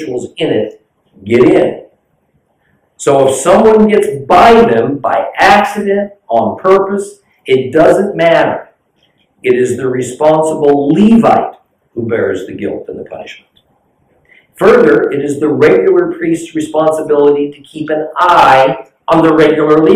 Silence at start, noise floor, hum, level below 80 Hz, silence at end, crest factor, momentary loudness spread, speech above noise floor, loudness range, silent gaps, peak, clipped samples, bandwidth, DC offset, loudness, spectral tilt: 0 s; -58 dBFS; none; -44 dBFS; 0 s; 10 dB; 14 LU; 49 dB; 5 LU; none; 0 dBFS; under 0.1%; 15 kHz; under 0.1%; -10 LUFS; -5.5 dB/octave